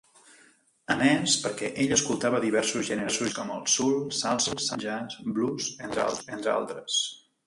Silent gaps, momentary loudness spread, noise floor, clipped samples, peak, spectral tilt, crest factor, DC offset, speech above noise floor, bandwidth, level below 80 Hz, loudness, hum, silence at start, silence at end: none; 8 LU; -61 dBFS; under 0.1%; -8 dBFS; -2.5 dB/octave; 20 dB; under 0.1%; 33 dB; 11.5 kHz; -64 dBFS; -27 LUFS; none; 0.9 s; 0.3 s